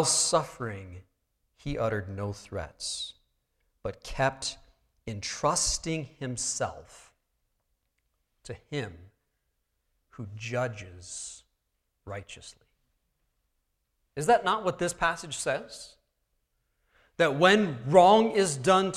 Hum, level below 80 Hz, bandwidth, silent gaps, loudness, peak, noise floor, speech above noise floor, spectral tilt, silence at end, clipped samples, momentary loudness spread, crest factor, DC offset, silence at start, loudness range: none; -54 dBFS; 15 kHz; none; -27 LUFS; -6 dBFS; -79 dBFS; 51 dB; -3.5 dB/octave; 0 s; under 0.1%; 22 LU; 24 dB; under 0.1%; 0 s; 15 LU